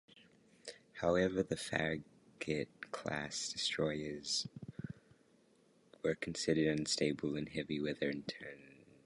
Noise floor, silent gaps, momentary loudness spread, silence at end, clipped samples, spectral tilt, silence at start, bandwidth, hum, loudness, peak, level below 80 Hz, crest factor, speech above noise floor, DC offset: -70 dBFS; none; 17 LU; 0.35 s; under 0.1%; -4 dB/octave; 0.15 s; 11.5 kHz; none; -38 LUFS; -16 dBFS; -66 dBFS; 22 dB; 32 dB; under 0.1%